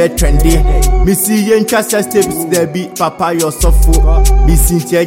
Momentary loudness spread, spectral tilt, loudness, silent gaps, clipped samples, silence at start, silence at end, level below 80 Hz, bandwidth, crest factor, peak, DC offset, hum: 4 LU; -5 dB/octave; -11 LUFS; none; under 0.1%; 0 s; 0 s; -12 dBFS; 17 kHz; 10 dB; 0 dBFS; under 0.1%; none